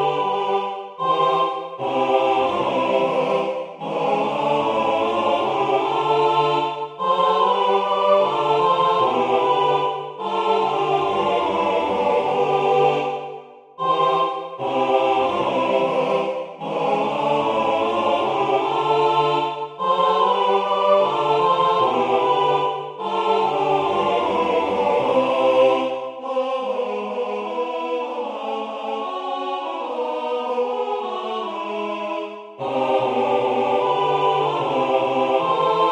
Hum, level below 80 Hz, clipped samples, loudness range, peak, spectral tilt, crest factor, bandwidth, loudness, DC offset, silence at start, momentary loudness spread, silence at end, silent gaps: none; -64 dBFS; under 0.1%; 7 LU; -4 dBFS; -5.5 dB/octave; 16 dB; 9.8 kHz; -20 LUFS; under 0.1%; 0 s; 9 LU; 0 s; none